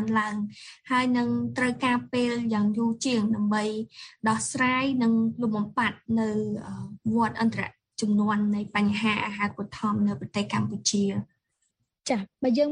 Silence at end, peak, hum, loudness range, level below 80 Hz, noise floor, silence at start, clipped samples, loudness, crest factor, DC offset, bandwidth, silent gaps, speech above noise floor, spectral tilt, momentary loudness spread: 0 s; -10 dBFS; none; 2 LU; -64 dBFS; -76 dBFS; 0 s; under 0.1%; -27 LUFS; 16 dB; under 0.1%; 10.5 kHz; none; 50 dB; -5 dB/octave; 10 LU